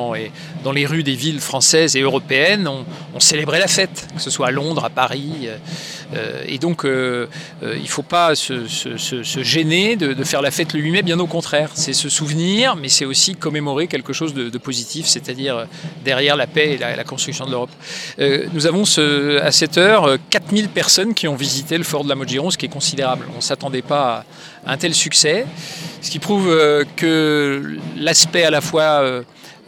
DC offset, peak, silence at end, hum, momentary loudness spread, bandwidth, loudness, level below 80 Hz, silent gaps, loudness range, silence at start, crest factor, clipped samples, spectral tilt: under 0.1%; 0 dBFS; 0.15 s; none; 13 LU; 18 kHz; -16 LUFS; -64 dBFS; none; 5 LU; 0 s; 18 dB; under 0.1%; -3 dB/octave